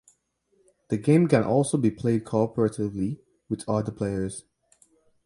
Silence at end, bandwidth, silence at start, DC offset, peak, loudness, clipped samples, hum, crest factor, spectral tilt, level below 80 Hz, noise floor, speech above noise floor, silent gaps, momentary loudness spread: 0.85 s; 11.5 kHz; 0.9 s; under 0.1%; -6 dBFS; -25 LUFS; under 0.1%; none; 20 dB; -7.5 dB/octave; -56 dBFS; -69 dBFS; 45 dB; none; 13 LU